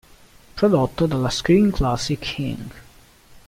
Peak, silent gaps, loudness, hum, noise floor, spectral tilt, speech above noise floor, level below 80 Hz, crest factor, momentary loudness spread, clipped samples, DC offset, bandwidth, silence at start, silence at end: -4 dBFS; none; -20 LUFS; none; -49 dBFS; -6 dB/octave; 29 dB; -36 dBFS; 16 dB; 15 LU; under 0.1%; under 0.1%; 16 kHz; 0.55 s; 0.65 s